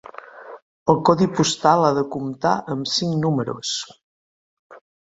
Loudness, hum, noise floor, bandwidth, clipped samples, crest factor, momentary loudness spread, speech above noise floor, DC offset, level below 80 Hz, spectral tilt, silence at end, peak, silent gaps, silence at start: -20 LUFS; none; -40 dBFS; 8 kHz; under 0.1%; 22 dB; 21 LU; 20 dB; under 0.1%; -58 dBFS; -5 dB/octave; 0.35 s; 0 dBFS; 0.62-0.86 s, 4.03-4.70 s; 0.35 s